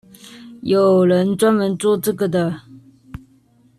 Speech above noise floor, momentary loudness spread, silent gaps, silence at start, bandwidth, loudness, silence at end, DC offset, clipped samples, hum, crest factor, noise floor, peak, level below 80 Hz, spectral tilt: 38 dB; 15 LU; none; 0.25 s; 14 kHz; -17 LUFS; 0.6 s; under 0.1%; under 0.1%; none; 14 dB; -54 dBFS; -6 dBFS; -52 dBFS; -6.5 dB/octave